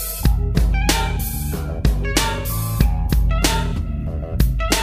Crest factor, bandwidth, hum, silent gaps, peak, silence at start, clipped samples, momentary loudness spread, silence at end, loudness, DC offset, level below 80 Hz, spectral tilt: 18 dB; 15.5 kHz; none; none; -2 dBFS; 0 s; under 0.1%; 7 LU; 0 s; -20 LUFS; under 0.1%; -20 dBFS; -4.5 dB/octave